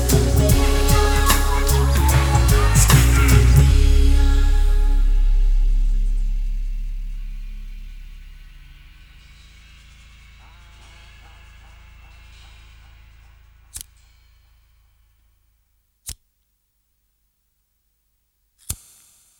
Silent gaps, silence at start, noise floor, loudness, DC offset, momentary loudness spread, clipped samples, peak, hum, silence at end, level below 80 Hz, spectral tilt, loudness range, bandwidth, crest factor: none; 0 s; -68 dBFS; -18 LUFS; under 0.1%; 23 LU; under 0.1%; 0 dBFS; none; 0.65 s; -20 dBFS; -4.5 dB/octave; 25 LU; 19.5 kHz; 18 dB